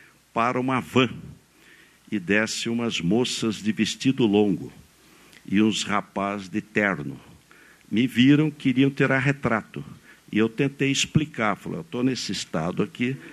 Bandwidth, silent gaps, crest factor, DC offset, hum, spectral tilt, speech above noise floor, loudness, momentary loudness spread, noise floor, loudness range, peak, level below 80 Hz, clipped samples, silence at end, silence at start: 13.5 kHz; none; 18 dB; under 0.1%; none; -5 dB/octave; 30 dB; -24 LUFS; 11 LU; -54 dBFS; 3 LU; -6 dBFS; -58 dBFS; under 0.1%; 0 s; 0.35 s